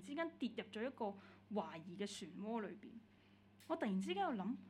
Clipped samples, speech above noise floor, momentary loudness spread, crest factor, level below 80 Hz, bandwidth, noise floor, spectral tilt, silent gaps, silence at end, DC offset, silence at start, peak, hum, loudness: under 0.1%; 23 dB; 16 LU; 18 dB; -84 dBFS; 13 kHz; -68 dBFS; -5.5 dB/octave; none; 0 s; under 0.1%; 0 s; -28 dBFS; none; -45 LUFS